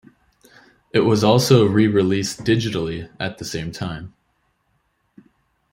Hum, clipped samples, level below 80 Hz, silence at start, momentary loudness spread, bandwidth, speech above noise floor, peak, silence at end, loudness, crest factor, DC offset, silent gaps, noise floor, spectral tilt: none; under 0.1%; -52 dBFS; 0.95 s; 14 LU; 16 kHz; 49 dB; -2 dBFS; 1.65 s; -19 LUFS; 20 dB; under 0.1%; none; -67 dBFS; -6 dB/octave